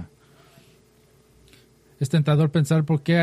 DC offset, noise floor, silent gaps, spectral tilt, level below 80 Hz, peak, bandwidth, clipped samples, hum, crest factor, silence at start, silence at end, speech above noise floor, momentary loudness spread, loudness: under 0.1%; -57 dBFS; none; -7 dB/octave; -60 dBFS; -8 dBFS; 12.5 kHz; under 0.1%; none; 16 dB; 0 s; 0 s; 38 dB; 10 LU; -21 LUFS